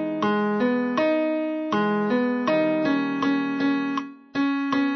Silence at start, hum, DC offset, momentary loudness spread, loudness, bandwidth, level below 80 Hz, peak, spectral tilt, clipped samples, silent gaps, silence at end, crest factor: 0 s; none; under 0.1%; 4 LU; -24 LUFS; 6.4 kHz; -70 dBFS; -12 dBFS; -7 dB/octave; under 0.1%; none; 0 s; 12 dB